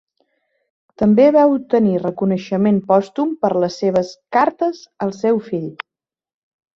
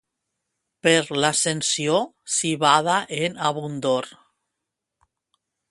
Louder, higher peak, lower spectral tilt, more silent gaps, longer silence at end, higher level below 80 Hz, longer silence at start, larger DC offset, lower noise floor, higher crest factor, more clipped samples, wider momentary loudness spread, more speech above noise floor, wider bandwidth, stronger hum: first, -17 LUFS vs -21 LUFS; about the same, -2 dBFS vs -2 dBFS; first, -7.5 dB/octave vs -3 dB/octave; neither; second, 1 s vs 1.6 s; first, -58 dBFS vs -68 dBFS; first, 1 s vs 0.85 s; neither; first, -89 dBFS vs -83 dBFS; second, 16 dB vs 22 dB; neither; first, 13 LU vs 8 LU; first, 73 dB vs 61 dB; second, 7.4 kHz vs 11.5 kHz; neither